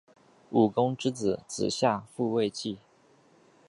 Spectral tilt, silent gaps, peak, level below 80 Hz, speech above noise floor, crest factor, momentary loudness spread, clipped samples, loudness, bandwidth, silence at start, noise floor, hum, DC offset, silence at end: -5.5 dB/octave; none; -10 dBFS; -66 dBFS; 34 dB; 20 dB; 9 LU; under 0.1%; -29 LUFS; 11.5 kHz; 0.5 s; -62 dBFS; none; under 0.1%; 0.9 s